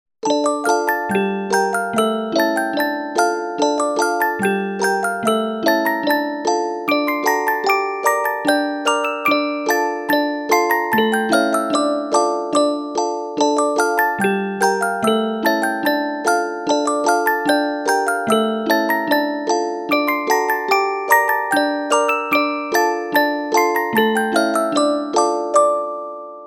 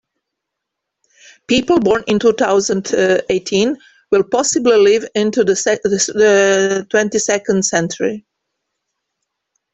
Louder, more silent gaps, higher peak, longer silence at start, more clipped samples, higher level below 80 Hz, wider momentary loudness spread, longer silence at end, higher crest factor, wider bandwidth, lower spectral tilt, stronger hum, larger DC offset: second, -18 LUFS vs -15 LUFS; neither; about the same, 0 dBFS vs -2 dBFS; second, 0.25 s vs 1.5 s; neither; second, -66 dBFS vs -52 dBFS; second, 3 LU vs 6 LU; second, 0 s vs 1.55 s; about the same, 18 dB vs 14 dB; first, 18 kHz vs 8.4 kHz; about the same, -3.5 dB/octave vs -3.5 dB/octave; neither; neither